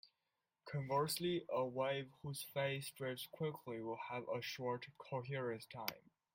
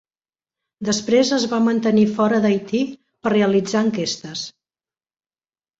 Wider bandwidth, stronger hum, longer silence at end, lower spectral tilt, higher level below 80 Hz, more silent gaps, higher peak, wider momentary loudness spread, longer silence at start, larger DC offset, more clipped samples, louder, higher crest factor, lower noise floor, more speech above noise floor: first, 16.5 kHz vs 7.8 kHz; neither; second, 0.35 s vs 1.3 s; about the same, -5 dB/octave vs -5 dB/octave; second, -82 dBFS vs -60 dBFS; neither; second, -18 dBFS vs -4 dBFS; second, 8 LU vs 11 LU; second, 0.05 s vs 0.8 s; neither; neither; second, -43 LUFS vs -19 LUFS; first, 26 dB vs 16 dB; about the same, -90 dBFS vs under -90 dBFS; second, 46 dB vs over 72 dB